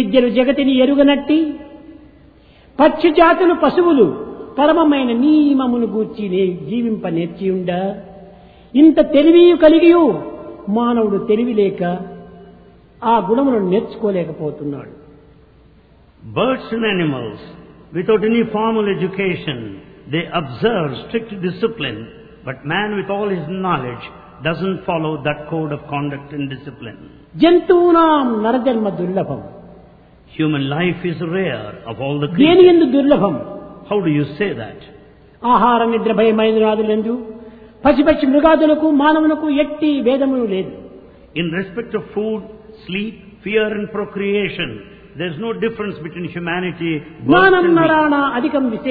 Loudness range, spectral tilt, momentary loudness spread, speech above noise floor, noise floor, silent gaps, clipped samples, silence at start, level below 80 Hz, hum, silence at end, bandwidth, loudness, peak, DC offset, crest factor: 9 LU; -10 dB/octave; 16 LU; 33 dB; -48 dBFS; none; under 0.1%; 0 s; -48 dBFS; none; 0 s; 4.9 kHz; -16 LUFS; 0 dBFS; under 0.1%; 16 dB